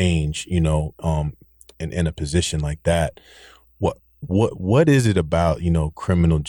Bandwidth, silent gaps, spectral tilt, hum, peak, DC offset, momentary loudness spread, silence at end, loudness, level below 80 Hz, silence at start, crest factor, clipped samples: 17.5 kHz; none; -6.5 dB/octave; none; -6 dBFS; under 0.1%; 9 LU; 0 s; -21 LUFS; -32 dBFS; 0 s; 14 dB; under 0.1%